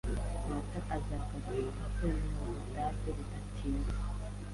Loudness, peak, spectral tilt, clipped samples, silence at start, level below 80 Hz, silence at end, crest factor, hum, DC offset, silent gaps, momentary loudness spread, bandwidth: -39 LUFS; -22 dBFS; -7 dB/octave; under 0.1%; 0.05 s; -38 dBFS; 0 s; 14 dB; 50 Hz at -40 dBFS; under 0.1%; none; 5 LU; 11.5 kHz